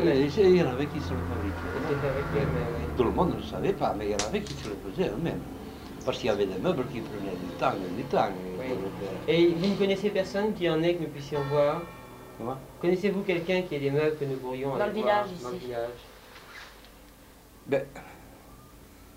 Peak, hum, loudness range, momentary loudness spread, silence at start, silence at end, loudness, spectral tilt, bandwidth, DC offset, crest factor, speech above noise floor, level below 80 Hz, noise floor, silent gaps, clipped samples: -10 dBFS; none; 5 LU; 17 LU; 0 s; 0.05 s; -29 LUFS; -6 dB/octave; 16 kHz; under 0.1%; 18 dB; 24 dB; -48 dBFS; -52 dBFS; none; under 0.1%